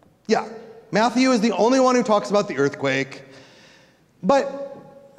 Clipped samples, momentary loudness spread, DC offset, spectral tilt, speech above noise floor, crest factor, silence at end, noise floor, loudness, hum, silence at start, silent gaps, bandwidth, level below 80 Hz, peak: under 0.1%; 17 LU; under 0.1%; -5 dB/octave; 35 dB; 16 dB; 0.4 s; -55 dBFS; -20 LUFS; none; 0.3 s; none; 11 kHz; -66 dBFS; -4 dBFS